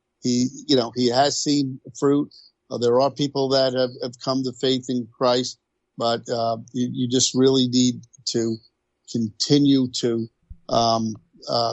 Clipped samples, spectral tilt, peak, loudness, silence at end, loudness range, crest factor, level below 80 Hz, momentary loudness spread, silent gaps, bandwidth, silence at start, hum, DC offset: under 0.1%; -4.5 dB/octave; -6 dBFS; -22 LUFS; 0 s; 2 LU; 16 dB; -58 dBFS; 11 LU; none; 8.4 kHz; 0.25 s; none; under 0.1%